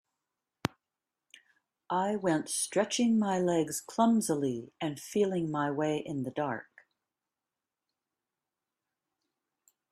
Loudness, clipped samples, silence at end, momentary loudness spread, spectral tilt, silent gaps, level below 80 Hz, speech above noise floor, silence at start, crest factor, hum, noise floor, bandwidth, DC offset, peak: -31 LUFS; under 0.1%; 3.3 s; 10 LU; -4.5 dB/octave; none; -74 dBFS; over 60 dB; 0.65 s; 28 dB; none; under -90 dBFS; 15 kHz; under 0.1%; -6 dBFS